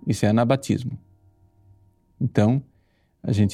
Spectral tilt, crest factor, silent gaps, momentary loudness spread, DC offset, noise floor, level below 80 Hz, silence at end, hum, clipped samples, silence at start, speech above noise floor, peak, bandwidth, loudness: -7 dB/octave; 18 dB; none; 14 LU; under 0.1%; -63 dBFS; -56 dBFS; 0 s; none; under 0.1%; 0.05 s; 43 dB; -4 dBFS; 13.5 kHz; -23 LUFS